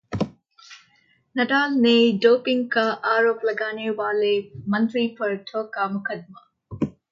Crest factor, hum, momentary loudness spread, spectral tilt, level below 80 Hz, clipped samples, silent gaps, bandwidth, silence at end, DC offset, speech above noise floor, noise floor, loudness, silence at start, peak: 18 dB; none; 13 LU; -6 dB/octave; -58 dBFS; under 0.1%; none; 7.2 kHz; 0.2 s; under 0.1%; 41 dB; -62 dBFS; -22 LUFS; 0.1 s; -4 dBFS